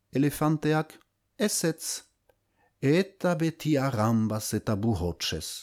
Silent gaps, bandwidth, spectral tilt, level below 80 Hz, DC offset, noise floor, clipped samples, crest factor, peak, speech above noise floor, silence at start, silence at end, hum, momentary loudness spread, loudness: none; 20 kHz; -5 dB/octave; -52 dBFS; under 0.1%; -70 dBFS; under 0.1%; 16 dB; -12 dBFS; 43 dB; 0.15 s; 0 s; none; 6 LU; -28 LUFS